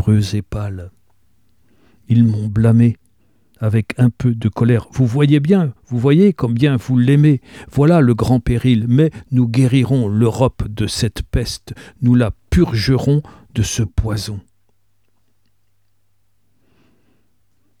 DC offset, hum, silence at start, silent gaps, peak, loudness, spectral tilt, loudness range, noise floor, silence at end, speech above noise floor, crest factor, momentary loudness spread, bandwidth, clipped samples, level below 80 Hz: 0.2%; none; 0 s; none; -2 dBFS; -16 LUFS; -7 dB/octave; 7 LU; -67 dBFS; 3.4 s; 52 dB; 16 dB; 11 LU; 13.5 kHz; under 0.1%; -34 dBFS